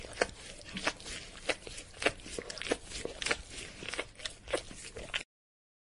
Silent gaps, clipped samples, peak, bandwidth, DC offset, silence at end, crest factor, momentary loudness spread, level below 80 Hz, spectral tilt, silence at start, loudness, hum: none; under 0.1%; -10 dBFS; 11.5 kHz; under 0.1%; 0.7 s; 30 dB; 10 LU; -54 dBFS; -2 dB/octave; 0 s; -38 LUFS; none